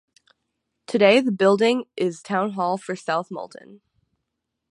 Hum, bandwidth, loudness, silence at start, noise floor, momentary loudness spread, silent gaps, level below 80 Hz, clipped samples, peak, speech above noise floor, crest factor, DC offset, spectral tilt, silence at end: none; 11 kHz; -21 LUFS; 0.9 s; -80 dBFS; 13 LU; none; -76 dBFS; under 0.1%; -2 dBFS; 59 dB; 20 dB; under 0.1%; -5.5 dB/octave; 0.95 s